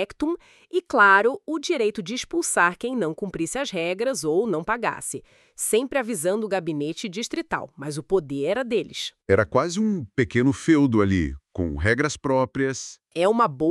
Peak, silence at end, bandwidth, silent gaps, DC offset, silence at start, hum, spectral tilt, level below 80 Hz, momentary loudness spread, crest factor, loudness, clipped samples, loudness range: -4 dBFS; 0 s; 13.5 kHz; none; under 0.1%; 0 s; none; -4.5 dB/octave; -46 dBFS; 11 LU; 20 dB; -23 LUFS; under 0.1%; 4 LU